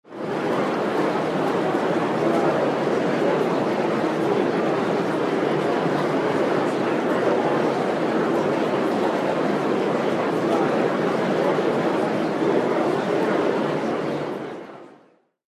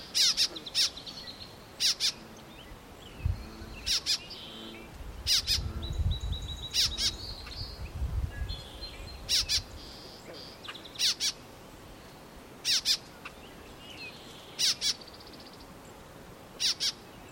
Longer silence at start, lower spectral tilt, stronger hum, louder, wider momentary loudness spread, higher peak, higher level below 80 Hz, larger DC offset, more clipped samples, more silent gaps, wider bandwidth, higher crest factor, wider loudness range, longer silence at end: about the same, 0.1 s vs 0 s; first, -6.5 dB/octave vs -1.5 dB/octave; neither; first, -22 LUFS vs -29 LUFS; second, 2 LU vs 23 LU; first, -8 dBFS vs -12 dBFS; second, -64 dBFS vs -44 dBFS; neither; neither; neither; second, 14.5 kHz vs 16.5 kHz; second, 14 dB vs 22 dB; about the same, 1 LU vs 3 LU; first, 0.6 s vs 0 s